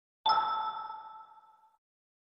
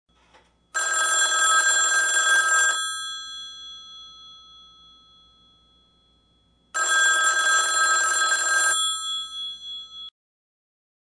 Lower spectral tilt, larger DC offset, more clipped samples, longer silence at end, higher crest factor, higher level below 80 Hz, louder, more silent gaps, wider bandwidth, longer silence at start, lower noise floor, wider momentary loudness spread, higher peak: first, -3.5 dB/octave vs 4 dB/octave; neither; neither; about the same, 1.05 s vs 0.95 s; about the same, 20 dB vs 16 dB; second, -76 dBFS vs -68 dBFS; second, -32 LUFS vs -20 LUFS; neither; second, 5.8 kHz vs 10 kHz; second, 0.25 s vs 0.75 s; about the same, -60 dBFS vs -63 dBFS; about the same, 21 LU vs 20 LU; second, -16 dBFS vs -8 dBFS